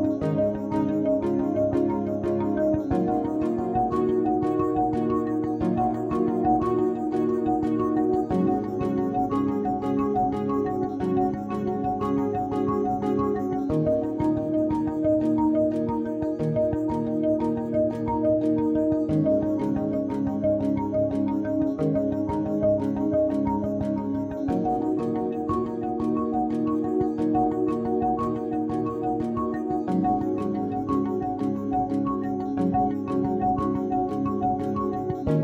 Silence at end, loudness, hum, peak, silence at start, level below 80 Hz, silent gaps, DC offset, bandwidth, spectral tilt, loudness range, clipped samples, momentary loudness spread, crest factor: 0 s; -25 LUFS; none; -10 dBFS; 0 s; -48 dBFS; none; under 0.1%; 7.8 kHz; -10 dB/octave; 2 LU; under 0.1%; 4 LU; 14 dB